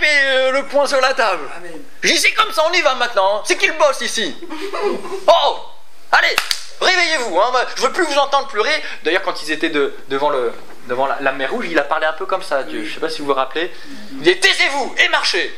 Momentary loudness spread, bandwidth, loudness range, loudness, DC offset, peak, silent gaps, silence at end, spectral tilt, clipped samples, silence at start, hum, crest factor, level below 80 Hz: 11 LU; 16 kHz; 4 LU; -16 LUFS; 5%; 0 dBFS; none; 0 s; -1.5 dB/octave; under 0.1%; 0 s; none; 18 dB; -66 dBFS